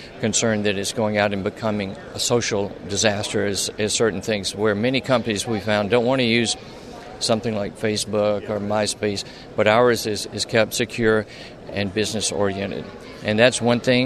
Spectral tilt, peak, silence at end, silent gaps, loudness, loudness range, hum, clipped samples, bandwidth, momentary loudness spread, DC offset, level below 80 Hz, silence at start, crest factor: -4 dB/octave; -2 dBFS; 0 s; none; -21 LUFS; 2 LU; none; under 0.1%; 13.5 kHz; 10 LU; under 0.1%; -52 dBFS; 0 s; 20 dB